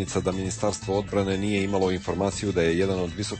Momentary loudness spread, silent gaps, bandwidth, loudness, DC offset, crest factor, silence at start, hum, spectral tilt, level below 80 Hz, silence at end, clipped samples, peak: 4 LU; none; 8.8 kHz; -26 LUFS; under 0.1%; 14 dB; 0 s; none; -5.5 dB/octave; -46 dBFS; 0 s; under 0.1%; -10 dBFS